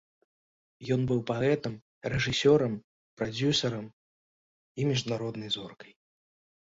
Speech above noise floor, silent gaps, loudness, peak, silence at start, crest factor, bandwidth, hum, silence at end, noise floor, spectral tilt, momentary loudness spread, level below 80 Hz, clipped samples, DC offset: over 61 dB; 1.82-2.01 s, 2.84-3.17 s, 3.93-4.75 s; -29 LUFS; -12 dBFS; 0.8 s; 20 dB; 8 kHz; none; 0.95 s; under -90 dBFS; -5.5 dB/octave; 16 LU; -58 dBFS; under 0.1%; under 0.1%